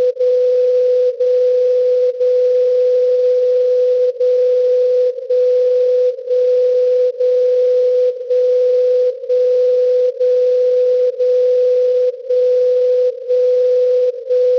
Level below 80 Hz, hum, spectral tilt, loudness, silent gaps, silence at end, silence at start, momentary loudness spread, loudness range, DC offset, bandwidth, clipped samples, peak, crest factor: -66 dBFS; none; -3.5 dB/octave; -14 LUFS; none; 0 s; 0 s; 3 LU; 0 LU; under 0.1%; 6 kHz; under 0.1%; -8 dBFS; 4 dB